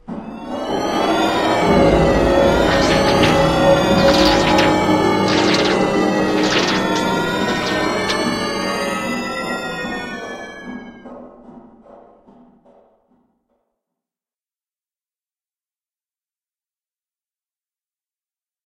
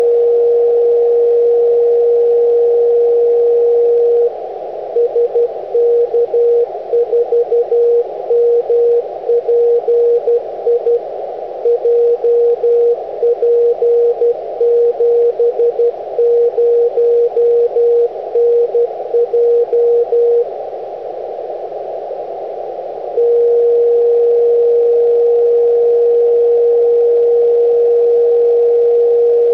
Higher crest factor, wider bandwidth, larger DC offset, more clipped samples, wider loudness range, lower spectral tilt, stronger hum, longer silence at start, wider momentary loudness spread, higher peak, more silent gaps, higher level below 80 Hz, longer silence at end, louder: first, 18 dB vs 6 dB; first, 15.5 kHz vs 3.2 kHz; second, under 0.1% vs 0.2%; neither; first, 14 LU vs 4 LU; second, -5 dB/octave vs -6.5 dB/octave; neither; about the same, 0.1 s vs 0 s; first, 15 LU vs 10 LU; first, 0 dBFS vs -6 dBFS; neither; first, -36 dBFS vs -62 dBFS; first, 7.05 s vs 0 s; second, -16 LUFS vs -12 LUFS